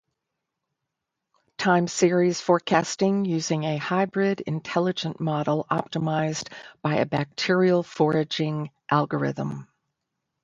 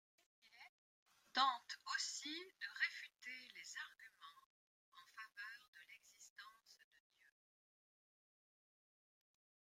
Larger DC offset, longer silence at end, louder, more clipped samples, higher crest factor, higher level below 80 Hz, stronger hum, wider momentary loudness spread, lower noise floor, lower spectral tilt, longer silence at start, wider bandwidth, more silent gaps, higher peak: neither; second, 0.8 s vs 2.9 s; first, -24 LUFS vs -45 LUFS; neither; second, 20 dB vs 28 dB; first, -66 dBFS vs under -90 dBFS; neither; second, 8 LU vs 24 LU; second, -83 dBFS vs under -90 dBFS; first, -5.5 dB/octave vs 2 dB/octave; first, 1.6 s vs 0.45 s; second, 9.4 kHz vs 16 kHz; second, none vs 0.69-1.06 s, 4.46-4.92 s, 5.68-5.73 s, 6.30-6.36 s; first, -6 dBFS vs -22 dBFS